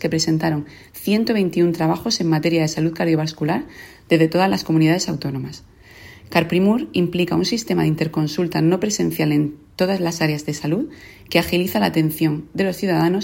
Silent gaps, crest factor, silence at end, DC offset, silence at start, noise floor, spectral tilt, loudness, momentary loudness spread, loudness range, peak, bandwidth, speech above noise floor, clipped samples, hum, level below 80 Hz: none; 18 dB; 0 s; under 0.1%; 0 s; -43 dBFS; -5.5 dB/octave; -20 LUFS; 7 LU; 2 LU; -2 dBFS; 16.5 kHz; 24 dB; under 0.1%; none; -50 dBFS